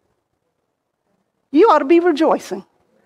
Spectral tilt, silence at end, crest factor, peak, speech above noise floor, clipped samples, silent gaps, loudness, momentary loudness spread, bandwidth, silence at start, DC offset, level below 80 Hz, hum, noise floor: -5 dB/octave; 0.45 s; 14 dB; -4 dBFS; 58 dB; under 0.1%; none; -14 LUFS; 16 LU; 11.5 kHz; 1.55 s; under 0.1%; -68 dBFS; none; -72 dBFS